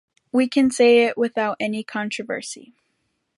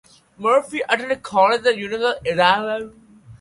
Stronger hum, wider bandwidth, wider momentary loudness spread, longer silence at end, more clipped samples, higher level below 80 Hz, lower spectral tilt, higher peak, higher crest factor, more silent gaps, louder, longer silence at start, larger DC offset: neither; about the same, 11.5 kHz vs 11.5 kHz; first, 14 LU vs 9 LU; first, 0.75 s vs 0.05 s; neither; second, -66 dBFS vs -58 dBFS; about the same, -4 dB/octave vs -4 dB/octave; second, -4 dBFS vs 0 dBFS; about the same, 18 dB vs 20 dB; neither; about the same, -20 LUFS vs -19 LUFS; about the same, 0.35 s vs 0.4 s; neither